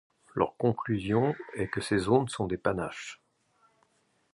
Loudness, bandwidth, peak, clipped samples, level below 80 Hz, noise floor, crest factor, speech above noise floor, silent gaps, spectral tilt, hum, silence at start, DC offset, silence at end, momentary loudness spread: -30 LUFS; 11.5 kHz; -10 dBFS; under 0.1%; -56 dBFS; -71 dBFS; 22 dB; 42 dB; none; -6.5 dB/octave; none; 0.35 s; under 0.1%; 1.2 s; 11 LU